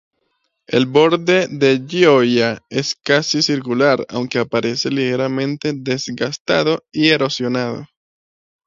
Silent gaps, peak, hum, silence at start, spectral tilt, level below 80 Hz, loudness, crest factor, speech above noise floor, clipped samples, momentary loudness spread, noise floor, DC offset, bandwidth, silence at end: 6.40-6.45 s; 0 dBFS; none; 0.7 s; -4.5 dB/octave; -60 dBFS; -17 LUFS; 18 dB; 52 dB; under 0.1%; 8 LU; -69 dBFS; under 0.1%; 7.6 kHz; 0.8 s